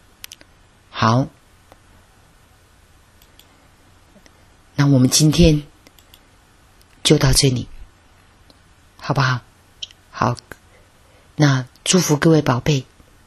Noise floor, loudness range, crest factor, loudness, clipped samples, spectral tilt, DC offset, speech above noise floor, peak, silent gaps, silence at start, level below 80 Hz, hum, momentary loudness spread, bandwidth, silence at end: -51 dBFS; 9 LU; 20 dB; -17 LUFS; under 0.1%; -5 dB/octave; under 0.1%; 36 dB; 0 dBFS; none; 0.95 s; -36 dBFS; none; 21 LU; 13.5 kHz; 0.45 s